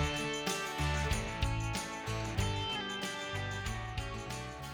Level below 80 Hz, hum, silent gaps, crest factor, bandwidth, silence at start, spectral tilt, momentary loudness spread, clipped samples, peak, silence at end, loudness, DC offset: -44 dBFS; none; none; 18 dB; over 20 kHz; 0 s; -4 dB/octave; 6 LU; under 0.1%; -18 dBFS; 0 s; -36 LUFS; under 0.1%